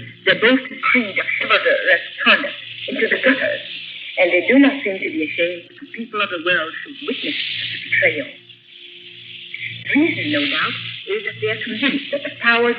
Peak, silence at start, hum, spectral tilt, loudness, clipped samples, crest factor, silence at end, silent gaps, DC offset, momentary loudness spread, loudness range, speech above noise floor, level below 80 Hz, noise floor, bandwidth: 0 dBFS; 0 s; none; -7 dB/octave; -18 LUFS; under 0.1%; 18 dB; 0 s; none; under 0.1%; 14 LU; 5 LU; 24 dB; -76 dBFS; -42 dBFS; 5.2 kHz